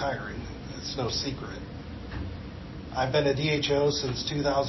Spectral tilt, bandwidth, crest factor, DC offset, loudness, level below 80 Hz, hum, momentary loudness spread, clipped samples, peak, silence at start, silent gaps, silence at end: -5 dB/octave; 6.2 kHz; 18 dB; under 0.1%; -29 LUFS; -44 dBFS; none; 15 LU; under 0.1%; -12 dBFS; 0 s; none; 0 s